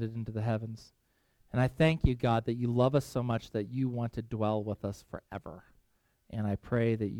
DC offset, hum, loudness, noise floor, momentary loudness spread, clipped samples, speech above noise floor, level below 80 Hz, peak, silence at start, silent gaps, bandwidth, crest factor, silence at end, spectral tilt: under 0.1%; none; -32 LUFS; -72 dBFS; 16 LU; under 0.1%; 41 dB; -48 dBFS; -12 dBFS; 0 s; none; 14 kHz; 20 dB; 0 s; -8 dB/octave